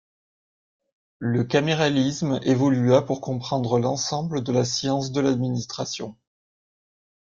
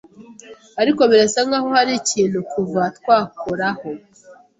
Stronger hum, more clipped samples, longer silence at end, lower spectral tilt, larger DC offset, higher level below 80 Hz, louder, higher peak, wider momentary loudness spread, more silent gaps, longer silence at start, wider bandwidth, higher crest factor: neither; neither; first, 1.15 s vs 0.25 s; first, -5.5 dB/octave vs -3.5 dB/octave; neither; about the same, -60 dBFS vs -60 dBFS; second, -23 LUFS vs -18 LUFS; about the same, -4 dBFS vs -2 dBFS; second, 9 LU vs 14 LU; neither; first, 1.2 s vs 0.2 s; about the same, 7.6 kHz vs 8.2 kHz; about the same, 20 dB vs 16 dB